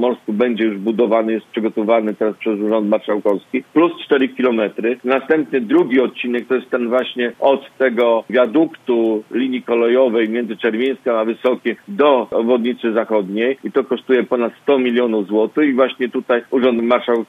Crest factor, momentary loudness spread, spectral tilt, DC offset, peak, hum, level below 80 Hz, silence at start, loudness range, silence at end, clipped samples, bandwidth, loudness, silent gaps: 16 dB; 5 LU; -7.5 dB/octave; under 0.1%; 0 dBFS; none; -68 dBFS; 0 s; 1 LU; 0.05 s; under 0.1%; 4.7 kHz; -17 LUFS; none